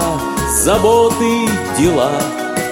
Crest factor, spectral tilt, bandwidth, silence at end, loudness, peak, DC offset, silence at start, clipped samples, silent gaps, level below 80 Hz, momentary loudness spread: 14 dB; -4 dB/octave; 16.5 kHz; 0 s; -14 LUFS; 0 dBFS; under 0.1%; 0 s; under 0.1%; none; -32 dBFS; 7 LU